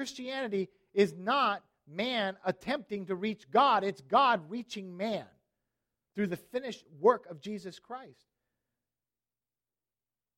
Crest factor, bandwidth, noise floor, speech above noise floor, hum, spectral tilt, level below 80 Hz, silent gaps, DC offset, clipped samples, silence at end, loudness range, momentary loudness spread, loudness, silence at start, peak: 22 dB; 15.5 kHz; under -90 dBFS; over 59 dB; none; -5 dB/octave; -76 dBFS; none; under 0.1%; under 0.1%; 2.25 s; 6 LU; 16 LU; -31 LUFS; 0 s; -12 dBFS